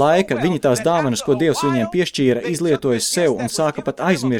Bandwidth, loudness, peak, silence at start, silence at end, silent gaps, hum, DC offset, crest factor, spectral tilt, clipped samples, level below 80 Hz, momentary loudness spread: 17.5 kHz; -18 LUFS; -4 dBFS; 0 s; 0 s; none; none; under 0.1%; 14 dB; -5 dB/octave; under 0.1%; -54 dBFS; 3 LU